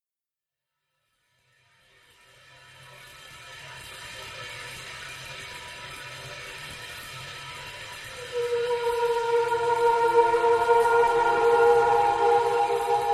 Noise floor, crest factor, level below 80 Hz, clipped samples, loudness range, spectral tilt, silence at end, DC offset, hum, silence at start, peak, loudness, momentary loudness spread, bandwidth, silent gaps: under -90 dBFS; 18 dB; -58 dBFS; under 0.1%; 20 LU; -3 dB/octave; 0 s; under 0.1%; none; 3.25 s; -8 dBFS; -22 LUFS; 19 LU; 14 kHz; none